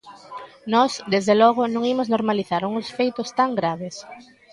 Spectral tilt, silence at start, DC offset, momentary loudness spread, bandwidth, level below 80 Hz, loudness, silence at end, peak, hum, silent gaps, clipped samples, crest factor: -5 dB/octave; 0.05 s; under 0.1%; 21 LU; 11.5 kHz; -66 dBFS; -21 LUFS; 0.3 s; -4 dBFS; none; none; under 0.1%; 18 dB